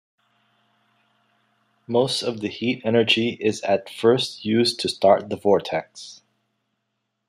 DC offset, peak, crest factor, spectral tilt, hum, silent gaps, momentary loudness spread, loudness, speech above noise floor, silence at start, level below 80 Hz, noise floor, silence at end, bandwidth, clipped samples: under 0.1%; -4 dBFS; 20 dB; -4.5 dB/octave; none; none; 10 LU; -21 LUFS; 56 dB; 1.9 s; -68 dBFS; -77 dBFS; 1.15 s; 14 kHz; under 0.1%